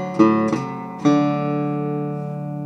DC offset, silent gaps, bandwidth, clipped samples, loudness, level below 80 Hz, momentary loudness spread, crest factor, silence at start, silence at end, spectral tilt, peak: under 0.1%; none; 8.2 kHz; under 0.1%; -21 LUFS; -64 dBFS; 11 LU; 18 dB; 0 s; 0 s; -8 dB/octave; -2 dBFS